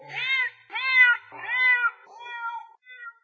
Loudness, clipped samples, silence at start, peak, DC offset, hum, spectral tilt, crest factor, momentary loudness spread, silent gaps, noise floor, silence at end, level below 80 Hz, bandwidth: -21 LUFS; under 0.1%; 0 s; -8 dBFS; under 0.1%; none; -0.5 dB/octave; 18 dB; 23 LU; none; -45 dBFS; 0.15 s; under -90 dBFS; 6.8 kHz